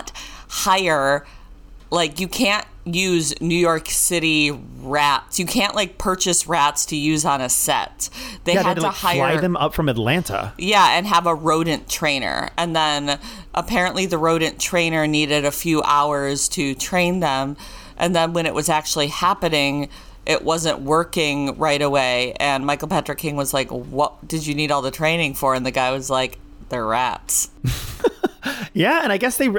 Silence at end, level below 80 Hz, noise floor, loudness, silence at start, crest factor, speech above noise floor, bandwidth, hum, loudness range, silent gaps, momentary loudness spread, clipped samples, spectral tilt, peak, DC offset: 0 s; -42 dBFS; -41 dBFS; -19 LUFS; 0 s; 14 dB; 21 dB; over 20 kHz; none; 3 LU; none; 8 LU; under 0.1%; -3.5 dB/octave; -6 dBFS; under 0.1%